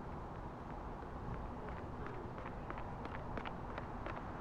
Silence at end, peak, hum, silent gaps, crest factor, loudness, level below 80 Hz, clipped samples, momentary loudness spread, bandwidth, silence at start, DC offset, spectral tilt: 0 s; -28 dBFS; none; none; 18 dB; -47 LUFS; -52 dBFS; under 0.1%; 3 LU; 10.5 kHz; 0 s; under 0.1%; -7.5 dB/octave